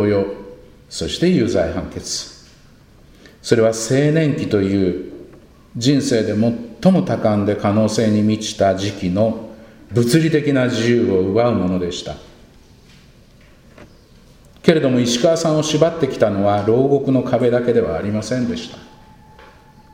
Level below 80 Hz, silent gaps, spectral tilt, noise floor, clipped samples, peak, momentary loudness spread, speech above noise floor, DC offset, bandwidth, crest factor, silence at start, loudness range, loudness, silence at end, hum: -46 dBFS; none; -6 dB/octave; -47 dBFS; under 0.1%; 0 dBFS; 11 LU; 30 dB; under 0.1%; 16 kHz; 18 dB; 0 s; 5 LU; -17 LUFS; 1.05 s; none